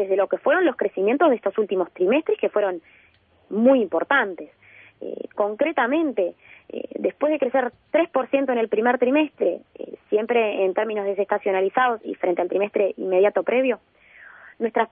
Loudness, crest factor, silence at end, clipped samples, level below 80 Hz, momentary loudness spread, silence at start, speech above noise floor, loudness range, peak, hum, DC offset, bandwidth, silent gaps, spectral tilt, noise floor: -22 LUFS; 16 dB; 0.05 s; under 0.1%; -72 dBFS; 12 LU; 0 s; 25 dB; 2 LU; -6 dBFS; none; under 0.1%; 3.7 kHz; none; -9.5 dB/octave; -47 dBFS